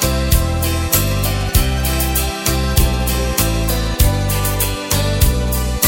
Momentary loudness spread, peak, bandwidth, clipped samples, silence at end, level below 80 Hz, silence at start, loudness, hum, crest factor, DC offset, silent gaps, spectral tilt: 3 LU; 0 dBFS; 17 kHz; under 0.1%; 0 s; -20 dBFS; 0 s; -17 LUFS; none; 16 dB; under 0.1%; none; -4 dB/octave